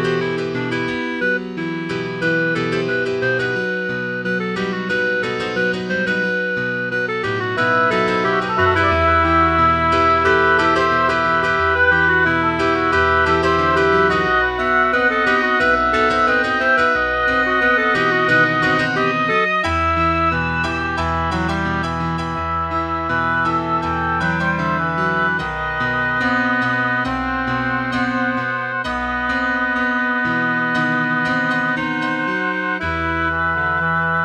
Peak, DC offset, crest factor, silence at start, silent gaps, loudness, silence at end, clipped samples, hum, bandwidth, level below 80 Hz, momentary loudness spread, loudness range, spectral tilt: -2 dBFS; under 0.1%; 16 dB; 0 s; none; -17 LUFS; 0 s; under 0.1%; none; 10.5 kHz; -38 dBFS; 7 LU; 5 LU; -6 dB/octave